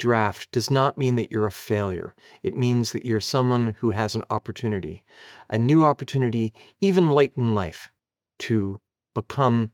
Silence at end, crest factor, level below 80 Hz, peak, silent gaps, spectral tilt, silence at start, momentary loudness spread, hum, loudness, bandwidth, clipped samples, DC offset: 0.05 s; 18 dB; -62 dBFS; -6 dBFS; none; -6.5 dB/octave; 0 s; 14 LU; none; -24 LUFS; 17.5 kHz; under 0.1%; under 0.1%